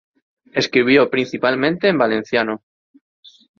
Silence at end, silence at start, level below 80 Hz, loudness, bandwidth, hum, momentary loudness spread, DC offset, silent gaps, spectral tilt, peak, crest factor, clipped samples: 1 s; 0.55 s; -60 dBFS; -17 LUFS; 7.2 kHz; none; 10 LU; under 0.1%; none; -5.5 dB/octave; -2 dBFS; 18 dB; under 0.1%